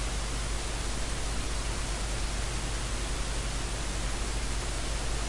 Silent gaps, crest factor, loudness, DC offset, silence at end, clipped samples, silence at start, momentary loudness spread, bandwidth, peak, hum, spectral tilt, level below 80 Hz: none; 12 dB; -33 LUFS; under 0.1%; 0 s; under 0.1%; 0 s; 0 LU; 11.5 kHz; -20 dBFS; none; -3 dB/octave; -34 dBFS